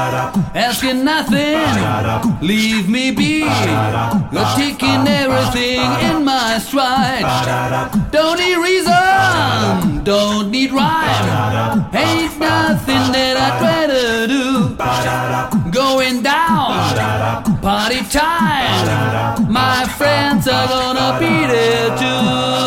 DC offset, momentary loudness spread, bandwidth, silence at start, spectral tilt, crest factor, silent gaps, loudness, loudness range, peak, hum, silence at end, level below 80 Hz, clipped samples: under 0.1%; 4 LU; 17 kHz; 0 s; -4.5 dB/octave; 14 dB; none; -14 LUFS; 1 LU; -2 dBFS; none; 0 s; -36 dBFS; under 0.1%